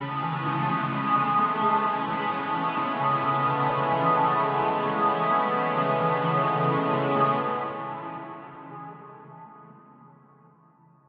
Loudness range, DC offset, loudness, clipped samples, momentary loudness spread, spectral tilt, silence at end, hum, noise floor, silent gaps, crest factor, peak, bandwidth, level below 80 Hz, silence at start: 8 LU; under 0.1%; -25 LUFS; under 0.1%; 17 LU; -4.5 dB/octave; 1.05 s; none; -58 dBFS; none; 16 dB; -10 dBFS; 5.2 kHz; -70 dBFS; 0 s